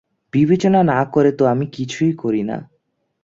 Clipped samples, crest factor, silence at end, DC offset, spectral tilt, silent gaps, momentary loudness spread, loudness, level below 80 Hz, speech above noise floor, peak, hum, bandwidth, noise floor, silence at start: under 0.1%; 16 dB; 0.6 s; under 0.1%; -7.5 dB/octave; none; 10 LU; -17 LUFS; -56 dBFS; 51 dB; -2 dBFS; none; 7.8 kHz; -68 dBFS; 0.35 s